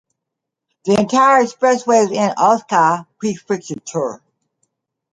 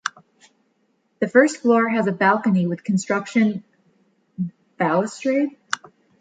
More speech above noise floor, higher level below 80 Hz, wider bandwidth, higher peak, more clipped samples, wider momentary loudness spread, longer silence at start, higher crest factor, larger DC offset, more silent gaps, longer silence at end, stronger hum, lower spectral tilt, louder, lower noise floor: first, 65 dB vs 48 dB; first, -62 dBFS vs -70 dBFS; first, 11 kHz vs 9.4 kHz; about the same, -2 dBFS vs -2 dBFS; neither; about the same, 12 LU vs 13 LU; first, 0.85 s vs 0.05 s; about the same, 16 dB vs 20 dB; neither; neither; first, 1 s vs 0.45 s; neither; second, -4.5 dB/octave vs -6 dB/octave; first, -16 LUFS vs -21 LUFS; first, -81 dBFS vs -67 dBFS